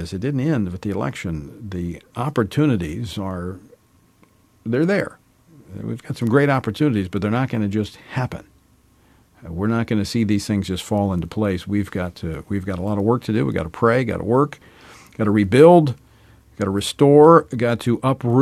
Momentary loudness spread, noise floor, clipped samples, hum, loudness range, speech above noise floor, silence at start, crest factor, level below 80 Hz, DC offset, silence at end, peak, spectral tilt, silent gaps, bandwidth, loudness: 16 LU; -56 dBFS; under 0.1%; none; 9 LU; 37 dB; 0 s; 18 dB; -48 dBFS; under 0.1%; 0 s; 0 dBFS; -7 dB/octave; none; 14.5 kHz; -20 LUFS